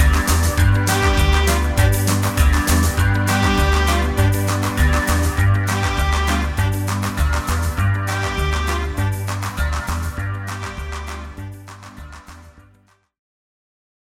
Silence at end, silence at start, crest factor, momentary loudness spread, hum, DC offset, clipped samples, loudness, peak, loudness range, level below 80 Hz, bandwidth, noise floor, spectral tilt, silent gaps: 1.55 s; 0 s; 16 dB; 13 LU; none; under 0.1%; under 0.1%; -19 LUFS; -2 dBFS; 13 LU; -22 dBFS; 17 kHz; -56 dBFS; -5 dB/octave; none